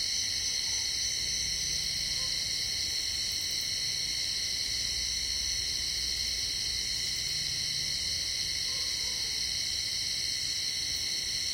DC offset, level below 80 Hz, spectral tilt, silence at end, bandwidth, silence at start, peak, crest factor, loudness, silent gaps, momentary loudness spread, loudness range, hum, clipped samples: under 0.1%; -52 dBFS; 0.5 dB/octave; 0 s; 16.5 kHz; 0 s; -18 dBFS; 14 dB; -29 LUFS; none; 1 LU; 0 LU; none; under 0.1%